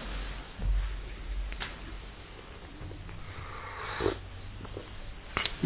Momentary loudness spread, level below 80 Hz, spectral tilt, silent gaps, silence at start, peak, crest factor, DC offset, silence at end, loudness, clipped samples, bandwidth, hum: 13 LU; -38 dBFS; -3.5 dB/octave; none; 0 s; -10 dBFS; 26 dB; under 0.1%; 0 s; -39 LUFS; under 0.1%; 4 kHz; none